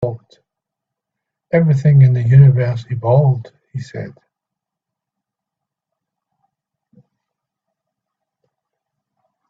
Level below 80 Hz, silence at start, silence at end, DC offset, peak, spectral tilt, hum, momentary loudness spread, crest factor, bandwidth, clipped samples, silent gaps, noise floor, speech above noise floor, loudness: -52 dBFS; 0 s; 5.4 s; under 0.1%; 0 dBFS; -10.5 dB/octave; none; 21 LU; 18 dB; 5.2 kHz; under 0.1%; none; -83 dBFS; 71 dB; -13 LUFS